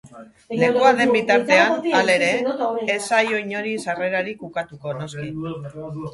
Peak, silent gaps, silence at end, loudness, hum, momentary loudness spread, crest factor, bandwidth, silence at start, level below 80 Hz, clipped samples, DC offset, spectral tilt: -2 dBFS; none; 0 s; -20 LUFS; none; 14 LU; 20 dB; 11.5 kHz; 0.05 s; -62 dBFS; under 0.1%; under 0.1%; -4.5 dB/octave